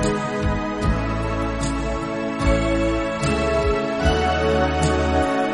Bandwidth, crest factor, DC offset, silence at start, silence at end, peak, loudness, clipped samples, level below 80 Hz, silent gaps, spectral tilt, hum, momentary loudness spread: 11.5 kHz; 16 dB; under 0.1%; 0 s; 0 s; -4 dBFS; -21 LUFS; under 0.1%; -28 dBFS; none; -6 dB/octave; none; 5 LU